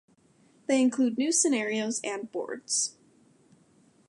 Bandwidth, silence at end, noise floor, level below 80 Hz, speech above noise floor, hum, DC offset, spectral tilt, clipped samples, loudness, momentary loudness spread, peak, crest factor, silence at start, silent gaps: 11.5 kHz; 1.2 s; -63 dBFS; -84 dBFS; 35 dB; none; under 0.1%; -2 dB/octave; under 0.1%; -27 LUFS; 11 LU; -12 dBFS; 18 dB; 0.7 s; none